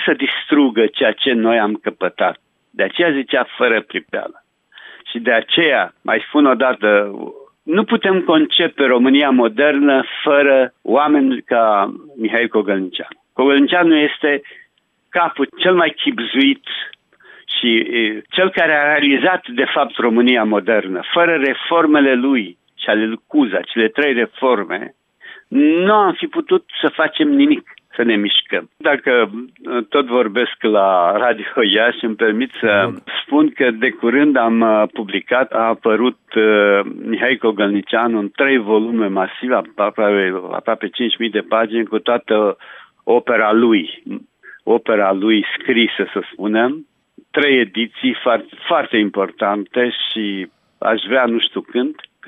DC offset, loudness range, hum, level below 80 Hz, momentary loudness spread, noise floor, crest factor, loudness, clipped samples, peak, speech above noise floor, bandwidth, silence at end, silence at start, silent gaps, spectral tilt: under 0.1%; 3 LU; none; -72 dBFS; 9 LU; -59 dBFS; 12 dB; -16 LUFS; under 0.1%; -2 dBFS; 44 dB; 4 kHz; 0.35 s; 0 s; none; -7.5 dB/octave